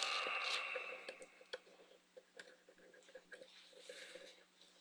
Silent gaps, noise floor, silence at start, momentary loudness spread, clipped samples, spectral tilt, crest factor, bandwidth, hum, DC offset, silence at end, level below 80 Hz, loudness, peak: none; -67 dBFS; 0 s; 26 LU; under 0.1%; 1 dB/octave; 28 dB; over 20 kHz; 60 Hz at -85 dBFS; under 0.1%; 0 s; under -90 dBFS; -44 LUFS; -20 dBFS